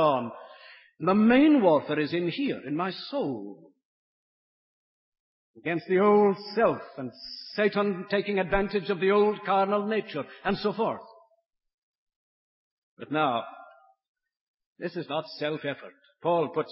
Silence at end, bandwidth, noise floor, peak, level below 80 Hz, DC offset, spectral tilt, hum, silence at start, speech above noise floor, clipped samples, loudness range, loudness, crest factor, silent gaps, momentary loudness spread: 0 s; 5.8 kHz; -54 dBFS; -10 dBFS; -58 dBFS; under 0.1%; -10 dB/octave; none; 0 s; 28 dB; under 0.1%; 10 LU; -26 LUFS; 18 dB; 3.85-5.12 s, 5.20-5.54 s, 11.74-12.07 s, 12.16-12.97 s, 14.08-14.15 s, 14.41-14.58 s, 14.66-14.76 s; 17 LU